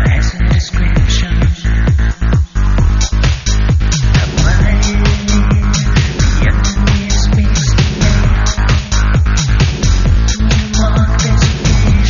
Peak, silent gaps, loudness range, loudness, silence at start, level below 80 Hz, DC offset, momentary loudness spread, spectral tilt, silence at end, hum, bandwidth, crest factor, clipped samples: 0 dBFS; none; 1 LU; -13 LUFS; 0 s; -12 dBFS; under 0.1%; 2 LU; -5.5 dB/octave; 0 s; none; 7.4 kHz; 10 dB; under 0.1%